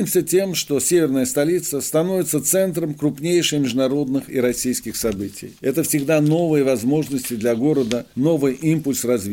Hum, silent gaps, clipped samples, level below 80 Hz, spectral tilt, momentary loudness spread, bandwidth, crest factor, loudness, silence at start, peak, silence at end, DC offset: none; none; under 0.1%; -54 dBFS; -4.5 dB/octave; 6 LU; 17 kHz; 16 dB; -20 LUFS; 0 s; -2 dBFS; 0 s; under 0.1%